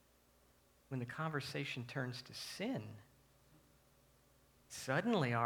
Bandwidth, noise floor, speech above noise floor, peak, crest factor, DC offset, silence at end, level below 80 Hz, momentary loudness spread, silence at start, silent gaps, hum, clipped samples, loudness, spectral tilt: 19.5 kHz; -71 dBFS; 30 dB; -20 dBFS; 22 dB; under 0.1%; 0 s; -76 dBFS; 12 LU; 0.9 s; none; 60 Hz at -70 dBFS; under 0.1%; -42 LUFS; -5.5 dB/octave